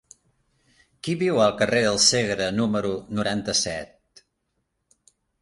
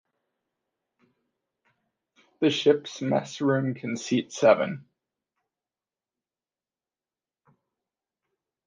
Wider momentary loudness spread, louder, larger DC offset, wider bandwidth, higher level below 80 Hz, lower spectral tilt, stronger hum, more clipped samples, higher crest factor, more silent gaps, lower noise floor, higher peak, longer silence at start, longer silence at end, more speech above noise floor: about the same, 12 LU vs 10 LU; first, -22 LUFS vs -25 LUFS; neither; first, 11.5 kHz vs 9.6 kHz; first, -54 dBFS vs -78 dBFS; second, -3 dB/octave vs -5.5 dB/octave; neither; neither; about the same, 22 dB vs 24 dB; neither; second, -76 dBFS vs under -90 dBFS; about the same, -4 dBFS vs -6 dBFS; second, 1.05 s vs 2.4 s; second, 1.55 s vs 3.85 s; second, 53 dB vs over 66 dB